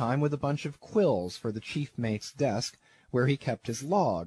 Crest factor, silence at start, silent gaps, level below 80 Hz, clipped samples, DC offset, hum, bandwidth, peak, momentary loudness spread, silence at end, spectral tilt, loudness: 16 dB; 0 s; none; -62 dBFS; under 0.1%; under 0.1%; none; 12.5 kHz; -14 dBFS; 8 LU; 0 s; -6 dB/octave; -30 LUFS